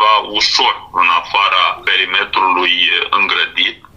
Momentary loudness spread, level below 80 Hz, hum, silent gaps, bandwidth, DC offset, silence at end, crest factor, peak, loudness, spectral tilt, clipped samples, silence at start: 3 LU; -52 dBFS; none; none; 11 kHz; 0.2%; 0.2 s; 12 dB; 0 dBFS; -12 LUFS; -0.5 dB/octave; under 0.1%; 0 s